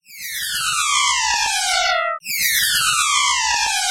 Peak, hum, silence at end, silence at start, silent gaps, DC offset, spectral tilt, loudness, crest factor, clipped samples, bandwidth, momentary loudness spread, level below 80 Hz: -4 dBFS; none; 0 s; 0.1 s; none; under 0.1%; 2.5 dB/octave; -17 LUFS; 14 dB; under 0.1%; 17 kHz; 6 LU; -50 dBFS